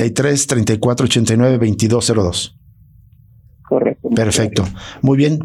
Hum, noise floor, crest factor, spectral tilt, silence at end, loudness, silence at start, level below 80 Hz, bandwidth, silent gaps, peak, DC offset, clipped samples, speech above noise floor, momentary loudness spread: none; -46 dBFS; 12 dB; -5 dB/octave; 0 s; -15 LUFS; 0 s; -44 dBFS; 14 kHz; none; -4 dBFS; under 0.1%; under 0.1%; 31 dB; 7 LU